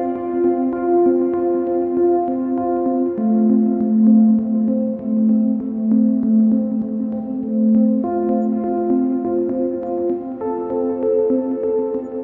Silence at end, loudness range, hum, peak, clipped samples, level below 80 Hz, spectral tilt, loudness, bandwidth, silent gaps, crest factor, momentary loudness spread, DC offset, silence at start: 0 s; 4 LU; none; -4 dBFS; under 0.1%; -56 dBFS; -13.5 dB/octave; -18 LUFS; 2.5 kHz; none; 14 dB; 7 LU; under 0.1%; 0 s